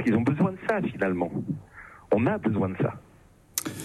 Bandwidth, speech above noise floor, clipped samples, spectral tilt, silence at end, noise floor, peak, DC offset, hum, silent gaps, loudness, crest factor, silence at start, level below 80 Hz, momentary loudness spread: 15 kHz; 30 dB; under 0.1%; -6 dB/octave; 0 s; -55 dBFS; -8 dBFS; under 0.1%; none; none; -27 LUFS; 20 dB; 0 s; -60 dBFS; 13 LU